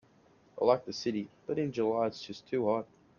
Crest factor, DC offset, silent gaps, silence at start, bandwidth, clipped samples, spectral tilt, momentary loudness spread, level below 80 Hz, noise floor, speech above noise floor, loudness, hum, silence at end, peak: 22 dB; under 0.1%; none; 0.55 s; 7.2 kHz; under 0.1%; -6 dB/octave; 9 LU; -72 dBFS; -64 dBFS; 32 dB; -32 LUFS; none; 0.35 s; -12 dBFS